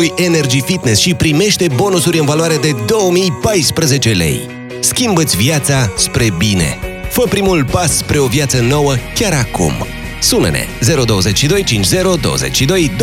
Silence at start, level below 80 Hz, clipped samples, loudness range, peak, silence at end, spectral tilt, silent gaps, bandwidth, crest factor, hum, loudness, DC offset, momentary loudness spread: 0 s; -30 dBFS; under 0.1%; 1 LU; 0 dBFS; 0 s; -4 dB/octave; none; 17 kHz; 12 dB; none; -12 LUFS; under 0.1%; 4 LU